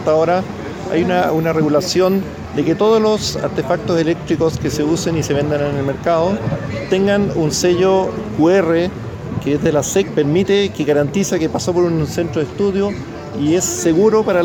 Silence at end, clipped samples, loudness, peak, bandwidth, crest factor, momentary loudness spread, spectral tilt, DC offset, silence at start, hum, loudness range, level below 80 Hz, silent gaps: 0 s; under 0.1%; -16 LUFS; -2 dBFS; 19 kHz; 14 dB; 7 LU; -5.5 dB/octave; under 0.1%; 0 s; none; 2 LU; -40 dBFS; none